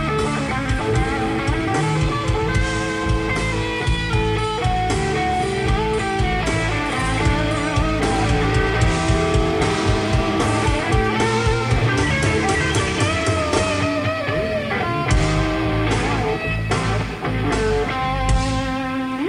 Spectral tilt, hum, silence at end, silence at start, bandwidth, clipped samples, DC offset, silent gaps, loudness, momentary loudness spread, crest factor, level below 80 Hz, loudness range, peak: -5.5 dB/octave; none; 0 s; 0 s; 11 kHz; under 0.1%; under 0.1%; none; -20 LUFS; 3 LU; 14 dB; -28 dBFS; 2 LU; -4 dBFS